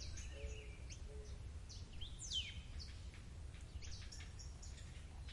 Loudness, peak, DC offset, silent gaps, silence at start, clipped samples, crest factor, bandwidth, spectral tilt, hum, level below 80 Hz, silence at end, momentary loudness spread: -51 LUFS; -32 dBFS; under 0.1%; none; 0 s; under 0.1%; 18 dB; 11.5 kHz; -3 dB/octave; none; -54 dBFS; 0 s; 11 LU